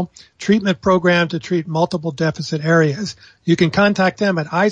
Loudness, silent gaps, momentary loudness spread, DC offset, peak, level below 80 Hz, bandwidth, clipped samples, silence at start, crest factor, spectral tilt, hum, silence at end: -17 LUFS; none; 11 LU; under 0.1%; -2 dBFS; -54 dBFS; 9.2 kHz; under 0.1%; 0 s; 14 dB; -6 dB/octave; none; 0 s